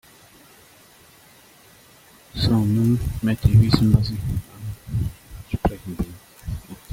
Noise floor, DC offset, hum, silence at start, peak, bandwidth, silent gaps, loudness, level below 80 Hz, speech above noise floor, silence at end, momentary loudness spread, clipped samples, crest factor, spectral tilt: -51 dBFS; under 0.1%; none; 2.35 s; 0 dBFS; 16 kHz; none; -22 LUFS; -36 dBFS; 32 dB; 0 s; 19 LU; under 0.1%; 22 dB; -7.5 dB/octave